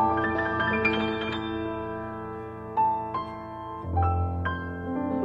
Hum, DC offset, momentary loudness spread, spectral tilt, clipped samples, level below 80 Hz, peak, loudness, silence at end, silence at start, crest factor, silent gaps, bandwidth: none; under 0.1%; 12 LU; -8 dB/octave; under 0.1%; -44 dBFS; -12 dBFS; -29 LUFS; 0 s; 0 s; 16 dB; none; 5.4 kHz